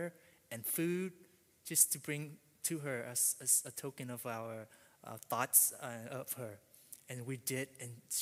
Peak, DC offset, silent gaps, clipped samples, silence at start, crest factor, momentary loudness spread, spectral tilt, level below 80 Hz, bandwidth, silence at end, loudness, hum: -14 dBFS; under 0.1%; none; under 0.1%; 0 s; 26 dB; 21 LU; -2.5 dB/octave; -84 dBFS; 16 kHz; 0 s; -35 LUFS; none